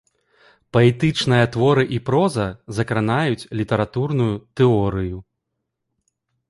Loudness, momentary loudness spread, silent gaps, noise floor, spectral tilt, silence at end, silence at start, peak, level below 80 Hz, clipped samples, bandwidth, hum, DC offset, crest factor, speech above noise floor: -20 LUFS; 9 LU; none; -78 dBFS; -7 dB/octave; 1.25 s; 0.75 s; -2 dBFS; -46 dBFS; under 0.1%; 11.5 kHz; none; under 0.1%; 18 dB; 59 dB